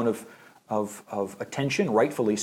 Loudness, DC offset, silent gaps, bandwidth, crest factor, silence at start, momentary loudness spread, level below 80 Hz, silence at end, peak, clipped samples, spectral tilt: -28 LUFS; under 0.1%; none; 16.5 kHz; 16 dB; 0 s; 10 LU; -70 dBFS; 0 s; -10 dBFS; under 0.1%; -5 dB/octave